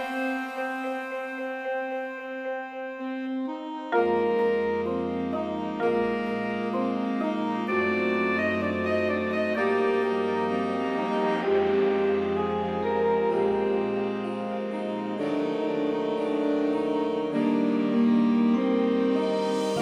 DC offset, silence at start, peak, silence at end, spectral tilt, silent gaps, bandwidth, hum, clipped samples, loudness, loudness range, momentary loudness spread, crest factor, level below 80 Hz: under 0.1%; 0 s; -12 dBFS; 0 s; -6.5 dB/octave; none; 11 kHz; none; under 0.1%; -27 LUFS; 4 LU; 8 LU; 14 dB; -62 dBFS